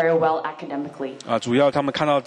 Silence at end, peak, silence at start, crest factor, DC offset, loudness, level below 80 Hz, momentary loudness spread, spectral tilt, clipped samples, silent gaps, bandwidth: 0 s; -6 dBFS; 0 s; 16 dB; under 0.1%; -22 LUFS; -64 dBFS; 12 LU; -5.5 dB/octave; under 0.1%; none; 9.8 kHz